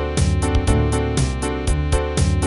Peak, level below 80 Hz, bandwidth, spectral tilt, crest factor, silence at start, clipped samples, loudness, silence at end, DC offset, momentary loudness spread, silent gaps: -2 dBFS; -22 dBFS; 11.5 kHz; -5.5 dB/octave; 16 dB; 0 s; under 0.1%; -20 LUFS; 0 s; 0.1%; 3 LU; none